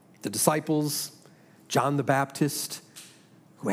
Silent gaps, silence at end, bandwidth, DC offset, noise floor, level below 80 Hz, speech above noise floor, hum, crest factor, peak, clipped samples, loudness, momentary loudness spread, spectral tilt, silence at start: none; 0 s; 16.5 kHz; under 0.1%; -56 dBFS; -78 dBFS; 29 dB; none; 24 dB; -4 dBFS; under 0.1%; -27 LUFS; 14 LU; -4.5 dB/octave; 0.25 s